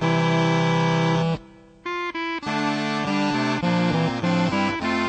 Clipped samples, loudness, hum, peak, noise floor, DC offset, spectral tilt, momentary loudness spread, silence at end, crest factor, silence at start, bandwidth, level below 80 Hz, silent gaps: under 0.1%; -23 LUFS; none; -8 dBFS; -45 dBFS; under 0.1%; -6 dB/octave; 7 LU; 0 s; 14 dB; 0 s; 8.8 kHz; -52 dBFS; none